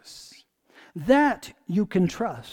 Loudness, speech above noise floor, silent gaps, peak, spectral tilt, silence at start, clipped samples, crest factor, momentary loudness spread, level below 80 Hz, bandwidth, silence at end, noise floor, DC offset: -24 LUFS; 32 dB; none; -8 dBFS; -6.5 dB/octave; 0.05 s; under 0.1%; 18 dB; 22 LU; -56 dBFS; 17.5 kHz; 0 s; -55 dBFS; under 0.1%